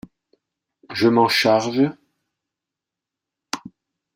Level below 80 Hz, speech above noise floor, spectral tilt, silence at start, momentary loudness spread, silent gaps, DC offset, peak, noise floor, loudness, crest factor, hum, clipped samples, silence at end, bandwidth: -66 dBFS; 69 dB; -4.5 dB/octave; 0.9 s; 16 LU; none; under 0.1%; -4 dBFS; -86 dBFS; -18 LUFS; 18 dB; none; under 0.1%; 0.5 s; 16 kHz